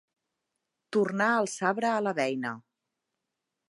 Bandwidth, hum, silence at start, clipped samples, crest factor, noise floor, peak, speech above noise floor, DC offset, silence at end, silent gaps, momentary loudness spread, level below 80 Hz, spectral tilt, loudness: 11.5 kHz; none; 0.9 s; under 0.1%; 20 dB; -85 dBFS; -10 dBFS; 58 dB; under 0.1%; 1.1 s; none; 9 LU; -84 dBFS; -4.5 dB/octave; -28 LUFS